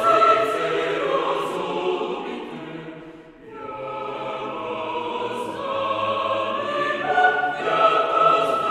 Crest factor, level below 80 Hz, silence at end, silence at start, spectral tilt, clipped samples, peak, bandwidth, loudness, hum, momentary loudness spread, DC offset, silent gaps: 18 dB; -62 dBFS; 0 s; 0 s; -4.5 dB/octave; under 0.1%; -4 dBFS; 13.5 kHz; -22 LUFS; none; 17 LU; under 0.1%; none